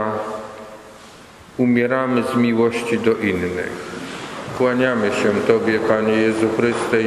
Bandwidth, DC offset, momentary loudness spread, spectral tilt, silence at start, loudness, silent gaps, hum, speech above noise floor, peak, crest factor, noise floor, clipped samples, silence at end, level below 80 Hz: 12.5 kHz; under 0.1%; 13 LU; -6 dB/octave; 0 s; -19 LUFS; none; none; 24 dB; 0 dBFS; 20 dB; -42 dBFS; under 0.1%; 0 s; -54 dBFS